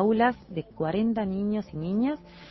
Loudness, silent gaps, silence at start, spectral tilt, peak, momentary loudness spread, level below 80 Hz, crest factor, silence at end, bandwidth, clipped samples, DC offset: -28 LUFS; none; 0 s; -9.5 dB/octave; -12 dBFS; 11 LU; -54 dBFS; 16 dB; 0 s; 6 kHz; under 0.1%; under 0.1%